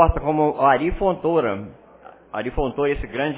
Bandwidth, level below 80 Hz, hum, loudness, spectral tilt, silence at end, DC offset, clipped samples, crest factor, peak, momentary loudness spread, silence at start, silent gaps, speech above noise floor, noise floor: 4 kHz; -32 dBFS; none; -21 LUFS; -10.5 dB/octave; 0 s; under 0.1%; under 0.1%; 20 dB; 0 dBFS; 12 LU; 0 s; none; 26 dB; -46 dBFS